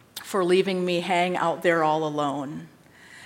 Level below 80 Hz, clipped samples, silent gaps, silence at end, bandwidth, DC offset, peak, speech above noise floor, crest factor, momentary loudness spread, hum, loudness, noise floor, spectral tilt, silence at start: -72 dBFS; under 0.1%; none; 0 s; 16.5 kHz; under 0.1%; -8 dBFS; 26 dB; 18 dB; 9 LU; none; -24 LUFS; -49 dBFS; -5.5 dB/octave; 0.15 s